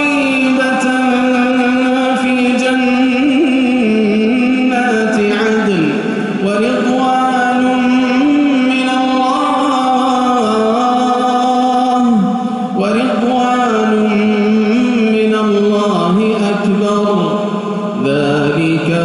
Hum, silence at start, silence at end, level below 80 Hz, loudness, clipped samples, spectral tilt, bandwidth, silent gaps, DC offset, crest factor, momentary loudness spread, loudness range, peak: none; 0 s; 0 s; -52 dBFS; -13 LUFS; under 0.1%; -6 dB/octave; 11.5 kHz; none; under 0.1%; 10 dB; 3 LU; 1 LU; -2 dBFS